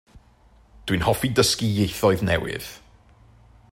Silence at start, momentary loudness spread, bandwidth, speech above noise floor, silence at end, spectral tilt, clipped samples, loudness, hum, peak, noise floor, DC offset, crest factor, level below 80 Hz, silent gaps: 0.15 s; 14 LU; 16.5 kHz; 33 dB; 0.95 s; -4.5 dB/octave; under 0.1%; -22 LUFS; none; -4 dBFS; -55 dBFS; under 0.1%; 20 dB; -44 dBFS; none